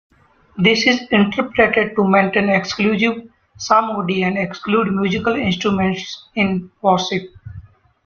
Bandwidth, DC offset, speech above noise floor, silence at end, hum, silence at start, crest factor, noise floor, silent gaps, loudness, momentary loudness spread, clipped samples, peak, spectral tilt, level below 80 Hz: 7 kHz; under 0.1%; 23 dB; 0.45 s; none; 0.55 s; 16 dB; -40 dBFS; none; -17 LUFS; 11 LU; under 0.1%; -2 dBFS; -5.5 dB/octave; -50 dBFS